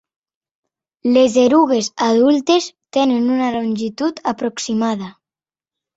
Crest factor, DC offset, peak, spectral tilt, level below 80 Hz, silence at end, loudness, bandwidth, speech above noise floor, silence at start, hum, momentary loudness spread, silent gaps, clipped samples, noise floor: 16 dB; under 0.1%; -2 dBFS; -4.5 dB/octave; -60 dBFS; 0.85 s; -17 LUFS; 8 kHz; over 74 dB; 1.05 s; none; 9 LU; none; under 0.1%; under -90 dBFS